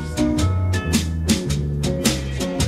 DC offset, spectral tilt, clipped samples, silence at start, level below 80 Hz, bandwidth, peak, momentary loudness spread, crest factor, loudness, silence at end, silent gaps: under 0.1%; -5 dB/octave; under 0.1%; 0 s; -30 dBFS; 16 kHz; -4 dBFS; 3 LU; 16 dB; -21 LUFS; 0 s; none